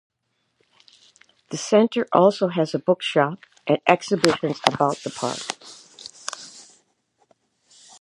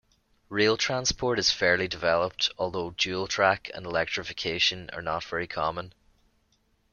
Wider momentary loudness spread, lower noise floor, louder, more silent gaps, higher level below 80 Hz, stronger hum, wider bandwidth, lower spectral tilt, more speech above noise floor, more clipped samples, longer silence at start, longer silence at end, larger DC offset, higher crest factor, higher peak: first, 17 LU vs 8 LU; first, -73 dBFS vs -69 dBFS; first, -22 LUFS vs -27 LUFS; neither; second, -66 dBFS vs -54 dBFS; neither; first, 13 kHz vs 11 kHz; first, -4.5 dB/octave vs -2.5 dB/octave; first, 52 dB vs 41 dB; neither; first, 1.5 s vs 0.5 s; first, 1.4 s vs 1.05 s; neither; about the same, 24 dB vs 22 dB; first, 0 dBFS vs -6 dBFS